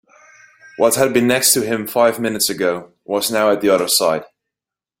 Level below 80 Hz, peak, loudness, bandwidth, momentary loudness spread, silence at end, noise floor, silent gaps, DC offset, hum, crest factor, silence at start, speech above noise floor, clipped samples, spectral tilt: -58 dBFS; 0 dBFS; -16 LUFS; 16.5 kHz; 7 LU; 0.75 s; -87 dBFS; none; under 0.1%; none; 18 dB; 0.8 s; 71 dB; under 0.1%; -2.5 dB/octave